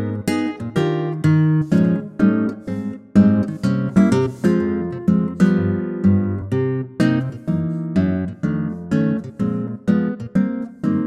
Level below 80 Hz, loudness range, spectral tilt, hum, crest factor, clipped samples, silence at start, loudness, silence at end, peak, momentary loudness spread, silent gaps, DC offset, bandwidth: -50 dBFS; 4 LU; -8.5 dB/octave; none; 14 dB; under 0.1%; 0 s; -19 LUFS; 0 s; -4 dBFS; 7 LU; none; under 0.1%; 12.5 kHz